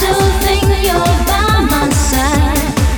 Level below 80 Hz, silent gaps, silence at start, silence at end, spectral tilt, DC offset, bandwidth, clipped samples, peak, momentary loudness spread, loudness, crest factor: -16 dBFS; none; 0 s; 0 s; -4.5 dB/octave; under 0.1%; over 20 kHz; under 0.1%; -2 dBFS; 1 LU; -12 LUFS; 10 dB